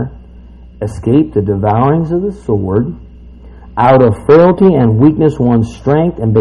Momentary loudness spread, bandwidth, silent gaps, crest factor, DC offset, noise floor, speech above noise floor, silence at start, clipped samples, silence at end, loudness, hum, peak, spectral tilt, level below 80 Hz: 14 LU; 11 kHz; none; 10 dB; under 0.1%; -34 dBFS; 25 dB; 0 s; 0.4%; 0 s; -11 LUFS; none; 0 dBFS; -9.5 dB/octave; -34 dBFS